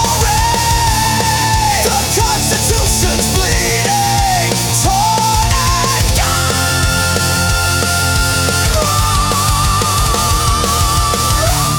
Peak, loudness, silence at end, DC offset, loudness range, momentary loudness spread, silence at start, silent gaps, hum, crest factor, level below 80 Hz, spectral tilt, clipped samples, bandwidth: -2 dBFS; -12 LUFS; 0 s; under 0.1%; 0 LU; 1 LU; 0 s; none; none; 12 dB; -22 dBFS; -3 dB/octave; under 0.1%; 19 kHz